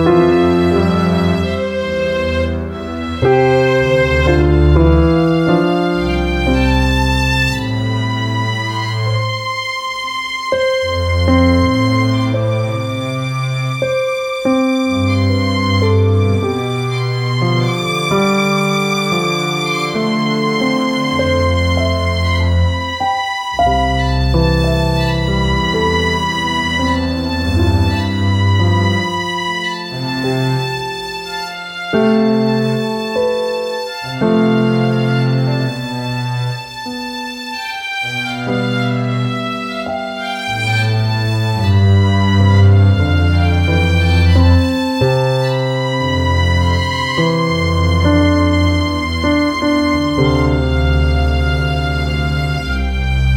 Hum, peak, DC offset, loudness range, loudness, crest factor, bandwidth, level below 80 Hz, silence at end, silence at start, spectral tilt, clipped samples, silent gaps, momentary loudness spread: none; 0 dBFS; under 0.1%; 5 LU; -15 LUFS; 14 dB; 16 kHz; -24 dBFS; 0 s; 0 s; -6.5 dB/octave; under 0.1%; none; 8 LU